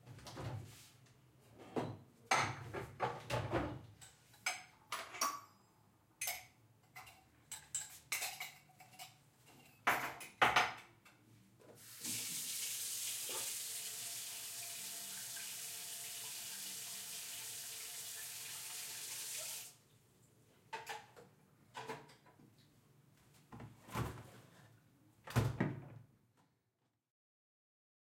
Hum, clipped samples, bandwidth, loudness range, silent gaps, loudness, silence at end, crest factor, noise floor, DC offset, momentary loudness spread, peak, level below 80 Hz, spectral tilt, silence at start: none; under 0.1%; 16.5 kHz; 13 LU; none; -42 LUFS; 2 s; 30 dB; -85 dBFS; under 0.1%; 21 LU; -16 dBFS; -68 dBFS; -2.5 dB/octave; 0.05 s